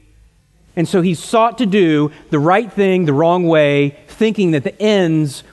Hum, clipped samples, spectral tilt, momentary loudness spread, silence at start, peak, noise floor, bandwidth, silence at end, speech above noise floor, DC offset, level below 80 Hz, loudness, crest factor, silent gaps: none; under 0.1%; -6.5 dB/octave; 6 LU; 0.75 s; -2 dBFS; -51 dBFS; 12.5 kHz; 0.1 s; 37 dB; under 0.1%; -54 dBFS; -15 LUFS; 14 dB; none